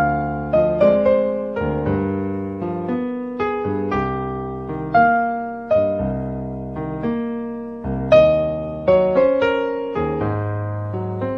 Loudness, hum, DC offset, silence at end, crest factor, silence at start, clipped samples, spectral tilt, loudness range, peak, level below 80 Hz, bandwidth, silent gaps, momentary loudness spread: -20 LUFS; none; 0.1%; 0 s; 18 dB; 0 s; under 0.1%; -9 dB/octave; 5 LU; -2 dBFS; -40 dBFS; 6.2 kHz; none; 12 LU